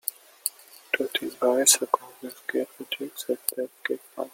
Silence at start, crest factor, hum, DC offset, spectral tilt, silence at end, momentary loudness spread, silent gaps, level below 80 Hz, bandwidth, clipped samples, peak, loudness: 0.05 s; 28 dB; none; under 0.1%; 0 dB/octave; 0.05 s; 14 LU; none; -80 dBFS; 17 kHz; under 0.1%; 0 dBFS; -26 LUFS